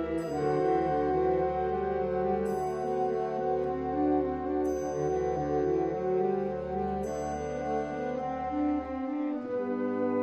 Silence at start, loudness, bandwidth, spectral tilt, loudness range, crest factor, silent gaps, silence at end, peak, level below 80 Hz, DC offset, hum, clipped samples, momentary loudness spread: 0 s; -30 LUFS; 12.5 kHz; -7.5 dB/octave; 3 LU; 14 dB; none; 0 s; -16 dBFS; -50 dBFS; under 0.1%; none; under 0.1%; 6 LU